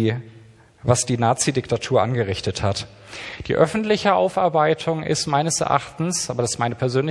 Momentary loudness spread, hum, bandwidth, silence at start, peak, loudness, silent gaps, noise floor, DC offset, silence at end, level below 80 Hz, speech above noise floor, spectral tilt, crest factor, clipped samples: 9 LU; none; 12 kHz; 0 s; 0 dBFS; -21 LUFS; none; -48 dBFS; under 0.1%; 0 s; -50 dBFS; 27 dB; -4.5 dB/octave; 20 dB; under 0.1%